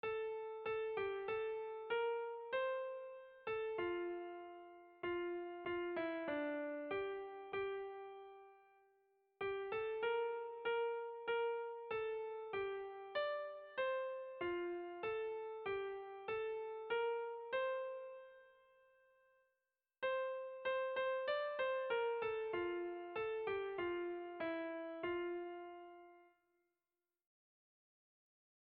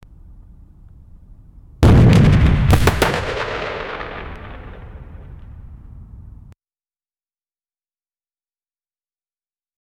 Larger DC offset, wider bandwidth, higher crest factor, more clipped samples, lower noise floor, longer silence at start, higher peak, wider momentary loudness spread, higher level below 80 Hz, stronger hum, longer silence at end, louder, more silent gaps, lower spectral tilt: neither; second, 4.8 kHz vs 19.5 kHz; about the same, 14 dB vs 18 dB; neither; about the same, under -90 dBFS vs under -90 dBFS; second, 0.05 s vs 1.8 s; second, -30 dBFS vs -2 dBFS; second, 9 LU vs 27 LU; second, -78 dBFS vs -26 dBFS; neither; second, 2.35 s vs 3.7 s; second, -43 LUFS vs -15 LUFS; neither; second, -2 dB/octave vs -7 dB/octave